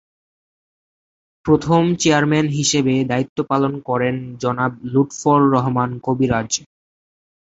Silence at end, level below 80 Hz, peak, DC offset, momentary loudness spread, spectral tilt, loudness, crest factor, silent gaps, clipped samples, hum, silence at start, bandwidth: 0.9 s; -50 dBFS; -2 dBFS; under 0.1%; 7 LU; -5 dB/octave; -18 LUFS; 18 dB; 3.29-3.36 s; under 0.1%; none; 1.45 s; 8 kHz